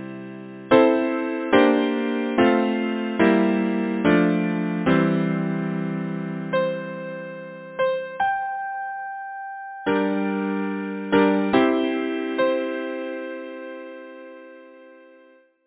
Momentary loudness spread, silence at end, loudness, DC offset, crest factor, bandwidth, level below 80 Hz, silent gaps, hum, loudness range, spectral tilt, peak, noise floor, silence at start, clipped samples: 17 LU; 0.7 s; -22 LUFS; under 0.1%; 20 dB; 4 kHz; -60 dBFS; none; none; 7 LU; -10.5 dB/octave; -4 dBFS; -54 dBFS; 0 s; under 0.1%